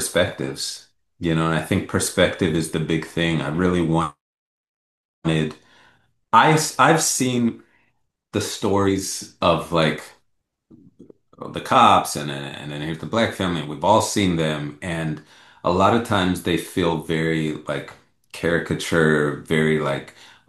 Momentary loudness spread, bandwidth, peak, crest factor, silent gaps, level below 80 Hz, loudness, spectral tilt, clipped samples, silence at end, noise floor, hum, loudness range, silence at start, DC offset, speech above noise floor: 13 LU; 12.5 kHz; -2 dBFS; 20 dB; 4.21-5.22 s; -54 dBFS; -21 LUFS; -4.5 dB/octave; under 0.1%; 0.4 s; -71 dBFS; none; 4 LU; 0 s; under 0.1%; 51 dB